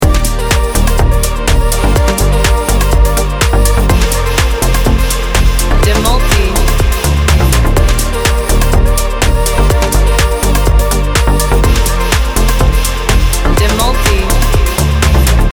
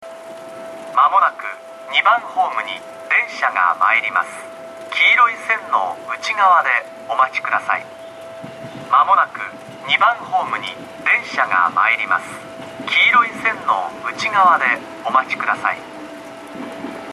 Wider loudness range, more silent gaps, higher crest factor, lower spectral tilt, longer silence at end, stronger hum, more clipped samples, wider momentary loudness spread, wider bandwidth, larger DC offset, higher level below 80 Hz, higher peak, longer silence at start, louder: second, 0 LU vs 3 LU; neither; second, 8 dB vs 16 dB; first, -4.5 dB/octave vs -2.5 dB/octave; about the same, 0 s vs 0 s; neither; neither; second, 2 LU vs 20 LU; first, over 20 kHz vs 13 kHz; neither; first, -10 dBFS vs -66 dBFS; about the same, 0 dBFS vs -2 dBFS; about the same, 0 s vs 0 s; first, -11 LUFS vs -16 LUFS